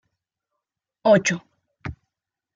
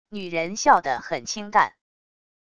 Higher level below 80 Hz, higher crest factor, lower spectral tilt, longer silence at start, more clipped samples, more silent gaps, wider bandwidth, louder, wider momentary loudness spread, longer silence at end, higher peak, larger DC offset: about the same, -56 dBFS vs -60 dBFS; about the same, 22 dB vs 22 dB; first, -4.5 dB/octave vs -3 dB/octave; first, 1.05 s vs 0.1 s; neither; neither; about the same, 9.4 kHz vs 10 kHz; first, -20 LUFS vs -23 LUFS; first, 20 LU vs 10 LU; second, 0.65 s vs 0.8 s; about the same, -4 dBFS vs -4 dBFS; neither